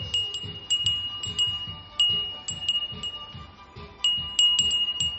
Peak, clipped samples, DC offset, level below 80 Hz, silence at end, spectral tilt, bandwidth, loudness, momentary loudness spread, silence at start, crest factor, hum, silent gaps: -8 dBFS; under 0.1%; under 0.1%; -52 dBFS; 0 s; 0 dB/octave; 8.4 kHz; -24 LUFS; 14 LU; 0 s; 20 dB; none; none